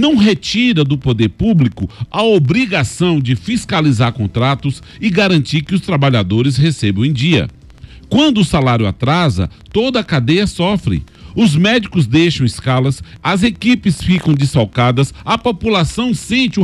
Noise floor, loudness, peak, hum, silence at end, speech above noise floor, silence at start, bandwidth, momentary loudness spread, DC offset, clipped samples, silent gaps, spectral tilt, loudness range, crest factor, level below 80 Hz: -36 dBFS; -14 LUFS; -2 dBFS; none; 0 s; 23 dB; 0 s; 12.5 kHz; 5 LU; under 0.1%; under 0.1%; none; -6 dB/octave; 1 LU; 10 dB; -36 dBFS